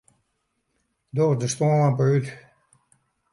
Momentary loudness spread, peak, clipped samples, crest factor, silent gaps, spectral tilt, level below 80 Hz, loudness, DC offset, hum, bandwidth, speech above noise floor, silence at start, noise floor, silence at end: 9 LU; -10 dBFS; under 0.1%; 14 dB; none; -6.5 dB/octave; -66 dBFS; -22 LUFS; under 0.1%; none; 11.5 kHz; 53 dB; 1.15 s; -74 dBFS; 0.95 s